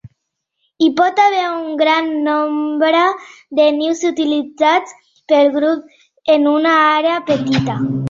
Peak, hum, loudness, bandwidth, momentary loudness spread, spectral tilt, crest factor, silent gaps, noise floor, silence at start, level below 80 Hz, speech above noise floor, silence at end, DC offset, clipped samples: -2 dBFS; none; -15 LUFS; 7.6 kHz; 6 LU; -5.5 dB/octave; 14 dB; none; -73 dBFS; 0.05 s; -58 dBFS; 59 dB; 0 s; under 0.1%; under 0.1%